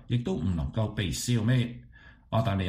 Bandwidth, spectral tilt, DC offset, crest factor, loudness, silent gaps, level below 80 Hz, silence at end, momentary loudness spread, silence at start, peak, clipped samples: 15.5 kHz; -6 dB/octave; under 0.1%; 14 dB; -29 LUFS; none; -44 dBFS; 0 s; 6 LU; 0 s; -14 dBFS; under 0.1%